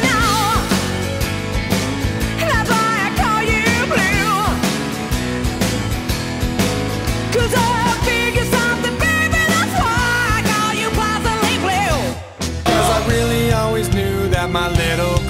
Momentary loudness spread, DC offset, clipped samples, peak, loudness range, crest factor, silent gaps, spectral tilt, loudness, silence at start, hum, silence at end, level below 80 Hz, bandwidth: 6 LU; under 0.1%; under 0.1%; -2 dBFS; 2 LU; 14 dB; none; -4.5 dB/octave; -17 LUFS; 0 s; none; 0 s; -28 dBFS; 16 kHz